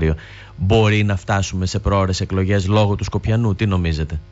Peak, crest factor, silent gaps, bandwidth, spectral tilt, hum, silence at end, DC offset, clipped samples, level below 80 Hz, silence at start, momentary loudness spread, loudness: -6 dBFS; 12 dB; none; 8 kHz; -6.5 dB/octave; none; 0.05 s; under 0.1%; under 0.1%; -32 dBFS; 0 s; 6 LU; -19 LUFS